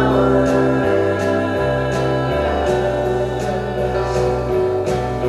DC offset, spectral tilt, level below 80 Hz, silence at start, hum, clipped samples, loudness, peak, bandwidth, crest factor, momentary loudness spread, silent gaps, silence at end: under 0.1%; -7 dB/octave; -32 dBFS; 0 s; none; under 0.1%; -18 LUFS; -4 dBFS; 13 kHz; 14 dB; 5 LU; none; 0 s